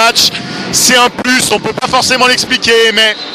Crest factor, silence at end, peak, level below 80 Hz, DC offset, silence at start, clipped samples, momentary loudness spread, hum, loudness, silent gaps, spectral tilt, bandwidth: 10 dB; 0 s; 0 dBFS; -44 dBFS; under 0.1%; 0 s; 0.4%; 6 LU; none; -8 LUFS; none; -1.5 dB/octave; over 20 kHz